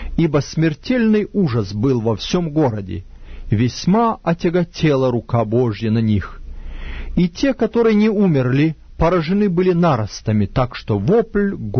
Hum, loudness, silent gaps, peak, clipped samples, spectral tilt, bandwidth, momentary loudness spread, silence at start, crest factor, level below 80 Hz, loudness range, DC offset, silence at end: none; -18 LUFS; none; -4 dBFS; under 0.1%; -7.5 dB/octave; 6.6 kHz; 7 LU; 0 s; 14 dB; -34 dBFS; 3 LU; under 0.1%; 0 s